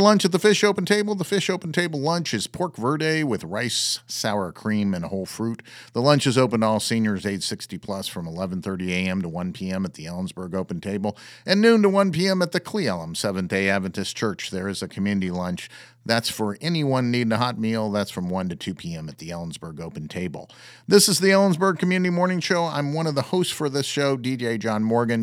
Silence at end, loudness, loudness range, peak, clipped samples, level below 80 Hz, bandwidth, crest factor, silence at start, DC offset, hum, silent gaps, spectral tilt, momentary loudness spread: 0 s; -23 LUFS; 7 LU; -2 dBFS; under 0.1%; -60 dBFS; 16.5 kHz; 22 dB; 0 s; under 0.1%; none; none; -4.5 dB/octave; 13 LU